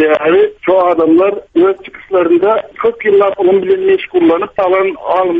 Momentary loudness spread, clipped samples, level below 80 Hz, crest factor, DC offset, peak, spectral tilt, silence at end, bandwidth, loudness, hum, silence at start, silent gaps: 4 LU; under 0.1%; -50 dBFS; 10 dB; under 0.1%; 0 dBFS; -8 dB/octave; 0 s; 3.9 kHz; -11 LUFS; none; 0 s; none